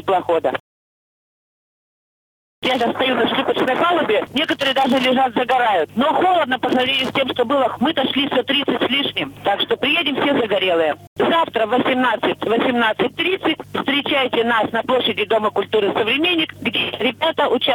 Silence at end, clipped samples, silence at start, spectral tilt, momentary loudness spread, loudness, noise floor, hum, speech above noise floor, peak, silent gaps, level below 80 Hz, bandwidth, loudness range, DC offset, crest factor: 0 s; under 0.1%; 0 s; -4.5 dB/octave; 4 LU; -18 LUFS; under -90 dBFS; none; over 72 dB; -6 dBFS; 0.60-2.62 s, 11.07-11.16 s; -58 dBFS; 19.5 kHz; 3 LU; under 0.1%; 12 dB